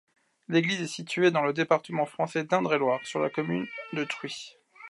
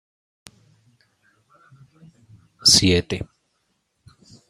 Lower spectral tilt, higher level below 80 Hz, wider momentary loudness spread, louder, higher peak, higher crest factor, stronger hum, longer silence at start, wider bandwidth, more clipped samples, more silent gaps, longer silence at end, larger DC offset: first, -5 dB/octave vs -2.5 dB/octave; second, -78 dBFS vs -52 dBFS; second, 10 LU vs 18 LU; second, -28 LUFS vs -17 LUFS; second, -10 dBFS vs -2 dBFS; second, 18 dB vs 24 dB; neither; second, 0.5 s vs 2.65 s; second, 11.5 kHz vs 15.5 kHz; neither; neither; second, 0.05 s vs 1.25 s; neither